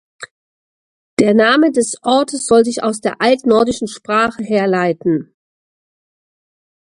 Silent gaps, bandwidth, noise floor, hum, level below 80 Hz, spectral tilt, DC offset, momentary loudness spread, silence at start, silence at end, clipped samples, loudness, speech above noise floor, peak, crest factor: 0.31-1.17 s; 11.5 kHz; under -90 dBFS; none; -54 dBFS; -4.5 dB/octave; under 0.1%; 11 LU; 0.2 s; 1.65 s; under 0.1%; -15 LUFS; over 76 dB; 0 dBFS; 16 dB